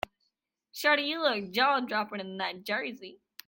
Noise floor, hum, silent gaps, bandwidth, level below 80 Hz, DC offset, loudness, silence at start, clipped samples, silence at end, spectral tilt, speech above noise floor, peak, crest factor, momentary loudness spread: -80 dBFS; none; none; 17 kHz; -70 dBFS; under 0.1%; -29 LUFS; 0.75 s; under 0.1%; 0.35 s; -3.5 dB/octave; 50 dB; -10 dBFS; 20 dB; 17 LU